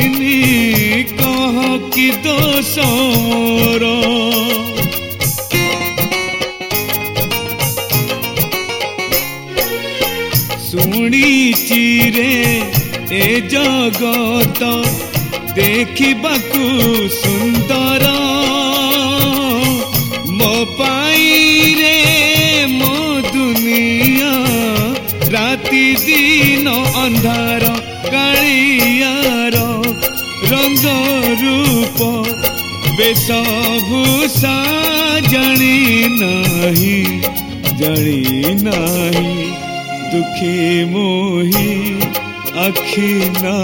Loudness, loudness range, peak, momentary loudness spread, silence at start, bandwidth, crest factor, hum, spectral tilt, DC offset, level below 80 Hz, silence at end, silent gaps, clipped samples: -12 LUFS; 5 LU; 0 dBFS; 7 LU; 0 s; over 20 kHz; 14 dB; none; -4 dB/octave; under 0.1%; -40 dBFS; 0 s; none; under 0.1%